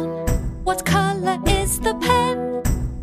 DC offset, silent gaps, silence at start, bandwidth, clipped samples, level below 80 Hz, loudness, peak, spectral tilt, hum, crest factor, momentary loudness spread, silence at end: under 0.1%; none; 0 s; 15.5 kHz; under 0.1%; -28 dBFS; -21 LUFS; -4 dBFS; -4.5 dB/octave; none; 16 dB; 6 LU; 0 s